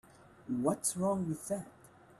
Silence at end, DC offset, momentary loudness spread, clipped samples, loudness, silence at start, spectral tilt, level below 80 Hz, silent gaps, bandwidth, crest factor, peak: 0.05 s; under 0.1%; 15 LU; under 0.1%; -35 LUFS; 0.2 s; -5.5 dB/octave; -70 dBFS; none; 15 kHz; 18 dB; -18 dBFS